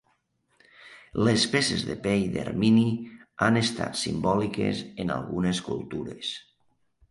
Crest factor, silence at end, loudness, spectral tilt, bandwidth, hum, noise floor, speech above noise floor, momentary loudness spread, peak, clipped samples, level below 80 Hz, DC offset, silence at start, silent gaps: 20 dB; 0.7 s; -26 LUFS; -5 dB/octave; 11.5 kHz; none; -71 dBFS; 45 dB; 12 LU; -8 dBFS; under 0.1%; -54 dBFS; under 0.1%; 0.8 s; none